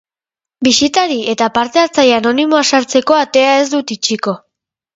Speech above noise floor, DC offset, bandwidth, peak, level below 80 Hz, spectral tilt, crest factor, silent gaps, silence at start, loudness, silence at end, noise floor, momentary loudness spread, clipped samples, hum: 76 dB; under 0.1%; 8 kHz; 0 dBFS; -54 dBFS; -2.5 dB/octave; 14 dB; none; 0.6 s; -12 LUFS; 0.6 s; -88 dBFS; 6 LU; under 0.1%; none